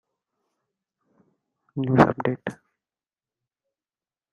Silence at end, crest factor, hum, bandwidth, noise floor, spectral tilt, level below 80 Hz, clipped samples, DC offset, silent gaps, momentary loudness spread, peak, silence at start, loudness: 1.8 s; 26 dB; none; 11 kHz; under -90 dBFS; -8.5 dB/octave; -58 dBFS; under 0.1%; under 0.1%; none; 17 LU; -2 dBFS; 1.75 s; -22 LUFS